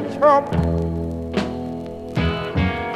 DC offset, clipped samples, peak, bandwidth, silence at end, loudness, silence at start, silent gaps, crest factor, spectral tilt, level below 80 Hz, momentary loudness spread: under 0.1%; under 0.1%; -4 dBFS; 11 kHz; 0 s; -21 LUFS; 0 s; none; 18 dB; -7.5 dB/octave; -34 dBFS; 12 LU